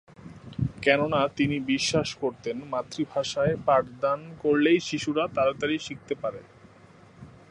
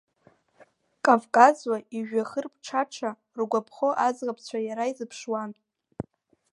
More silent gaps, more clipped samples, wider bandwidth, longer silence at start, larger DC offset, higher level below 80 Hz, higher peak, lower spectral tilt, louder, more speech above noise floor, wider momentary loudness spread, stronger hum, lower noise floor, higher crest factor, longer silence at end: neither; neither; about the same, 11.5 kHz vs 11.5 kHz; second, 0.25 s vs 1.05 s; neither; first, -54 dBFS vs -70 dBFS; second, -6 dBFS vs -2 dBFS; about the same, -5 dB/octave vs -4.5 dB/octave; about the same, -26 LUFS vs -26 LUFS; second, 27 dB vs 37 dB; second, 10 LU vs 18 LU; neither; second, -53 dBFS vs -63 dBFS; about the same, 20 dB vs 24 dB; second, 0.25 s vs 0.55 s